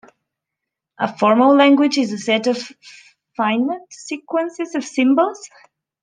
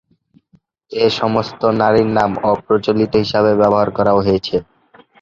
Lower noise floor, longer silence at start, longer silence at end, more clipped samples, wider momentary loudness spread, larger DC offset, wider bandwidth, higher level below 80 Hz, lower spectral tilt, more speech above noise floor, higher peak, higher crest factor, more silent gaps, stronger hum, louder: first, -82 dBFS vs -56 dBFS; about the same, 1 s vs 0.9 s; about the same, 0.55 s vs 0.6 s; neither; first, 18 LU vs 5 LU; neither; first, 9.6 kHz vs 7.4 kHz; second, -70 dBFS vs -46 dBFS; second, -4.5 dB/octave vs -7 dB/octave; first, 65 dB vs 41 dB; about the same, -2 dBFS vs -2 dBFS; about the same, 16 dB vs 14 dB; neither; neither; about the same, -17 LUFS vs -15 LUFS